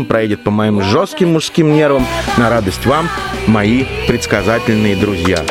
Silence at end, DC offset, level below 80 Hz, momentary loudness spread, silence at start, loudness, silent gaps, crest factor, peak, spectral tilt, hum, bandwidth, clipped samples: 0 s; 0.2%; -32 dBFS; 3 LU; 0 s; -13 LUFS; none; 12 dB; 0 dBFS; -5.5 dB/octave; none; 16.5 kHz; under 0.1%